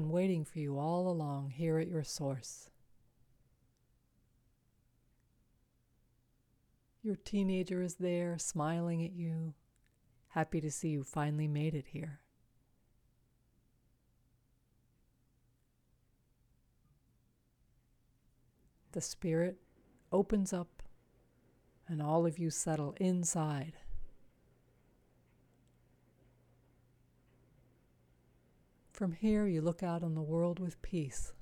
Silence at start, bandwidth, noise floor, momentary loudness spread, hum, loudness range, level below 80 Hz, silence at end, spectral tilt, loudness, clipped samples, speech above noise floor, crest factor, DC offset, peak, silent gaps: 0 s; 15 kHz; -74 dBFS; 11 LU; none; 10 LU; -60 dBFS; 0.05 s; -6 dB/octave; -37 LUFS; under 0.1%; 38 dB; 18 dB; under 0.1%; -22 dBFS; none